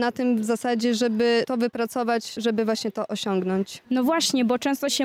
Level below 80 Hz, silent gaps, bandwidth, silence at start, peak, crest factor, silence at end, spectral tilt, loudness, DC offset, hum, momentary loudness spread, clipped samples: -68 dBFS; none; 16 kHz; 0 s; -12 dBFS; 12 dB; 0 s; -4 dB/octave; -24 LUFS; under 0.1%; none; 6 LU; under 0.1%